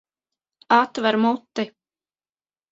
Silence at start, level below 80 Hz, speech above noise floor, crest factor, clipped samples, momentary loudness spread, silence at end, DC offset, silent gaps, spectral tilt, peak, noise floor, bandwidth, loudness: 0.7 s; -72 dBFS; over 70 dB; 24 dB; under 0.1%; 11 LU; 1.05 s; under 0.1%; none; -5 dB/octave; 0 dBFS; under -90 dBFS; 7.8 kHz; -21 LUFS